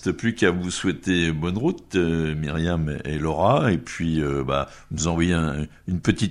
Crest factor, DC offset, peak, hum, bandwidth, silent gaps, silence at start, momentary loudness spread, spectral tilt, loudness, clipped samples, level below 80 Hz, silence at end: 20 dB; under 0.1%; -2 dBFS; none; 11 kHz; none; 0 s; 6 LU; -5.5 dB/octave; -24 LUFS; under 0.1%; -40 dBFS; 0 s